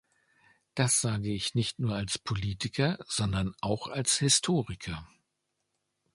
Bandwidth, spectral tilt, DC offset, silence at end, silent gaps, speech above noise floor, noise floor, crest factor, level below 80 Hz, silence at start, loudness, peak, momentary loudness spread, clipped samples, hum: 11.5 kHz; -3.5 dB/octave; under 0.1%; 1.1 s; none; 51 dB; -81 dBFS; 22 dB; -52 dBFS; 0.75 s; -29 LUFS; -10 dBFS; 11 LU; under 0.1%; none